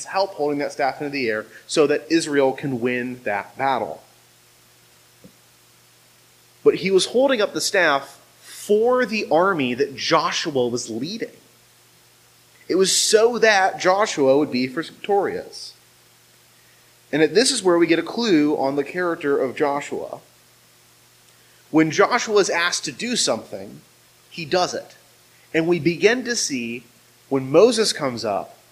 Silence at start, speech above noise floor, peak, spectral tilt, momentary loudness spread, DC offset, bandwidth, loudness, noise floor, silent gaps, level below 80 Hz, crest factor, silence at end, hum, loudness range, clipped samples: 0 s; 34 dB; 0 dBFS; -3.5 dB/octave; 14 LU; under 0.1%; 15.5 kHz; -20 LUFS; -54 dBFS; none; -66 dBFS; 20 dB; 0.2 s; none; 6 LU; under 0.1%